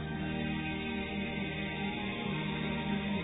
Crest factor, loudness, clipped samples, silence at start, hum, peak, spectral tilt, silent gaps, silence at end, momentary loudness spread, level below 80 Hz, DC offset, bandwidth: 12 dB; -35 LUFS; under 0.1%; 0 s; none; -22 dBFS; -4 dB/octave; none; 0 s; 2 LU; -50 dBFS; under 0.1%; 3.9 kHz